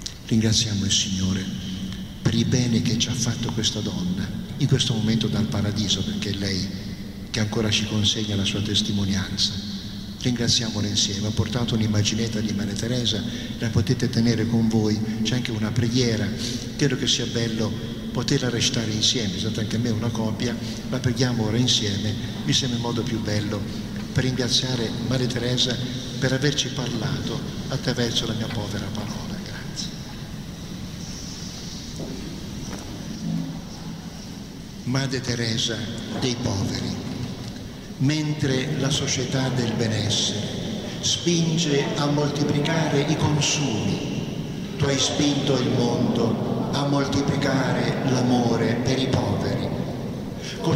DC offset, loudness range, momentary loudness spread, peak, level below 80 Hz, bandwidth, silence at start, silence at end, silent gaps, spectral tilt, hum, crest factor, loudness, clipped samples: under 0.1%; 6 LU; 12 LU; -8 dBFS; -44 dBFS; 16 kHz; 0 s; 0 s; none; -4.5 dB/octave; none; 16 dB; -24 LUFS; under 0.1%